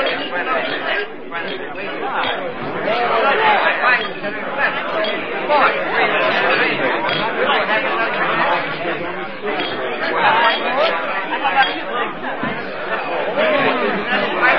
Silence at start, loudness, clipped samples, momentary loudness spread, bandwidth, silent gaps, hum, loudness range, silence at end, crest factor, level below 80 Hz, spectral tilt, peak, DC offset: 0 s; -18 LUFS; under 0.1%; 9 LU; 6.2 kHz; none; none; 2 LU; 0 s; 16 dB; -52 dBFS; -6 dB/octave; -2 dBFS; 2%